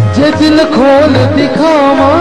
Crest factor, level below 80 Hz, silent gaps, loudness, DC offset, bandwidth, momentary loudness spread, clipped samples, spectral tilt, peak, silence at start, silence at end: 6 dB; -36 dBFS; none; -7 LUFS; 3%; 11 kHz; 3 LU; under 0.1%; -6.5 dB/octave; 0 dBFS; 0 s; 0 s